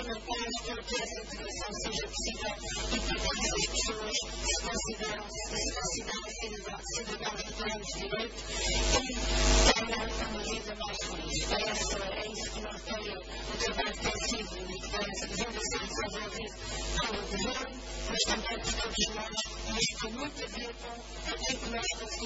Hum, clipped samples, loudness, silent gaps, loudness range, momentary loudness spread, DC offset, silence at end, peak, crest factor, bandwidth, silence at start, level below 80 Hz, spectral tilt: none; under 0.1%; -33 LUFS; none; 5 LU; 9 LU; under 0.1%; 0 s; -10 dBFS; 24 dB; 8 kHz; 0 s; -40 dBFS; -2.5 dB/octave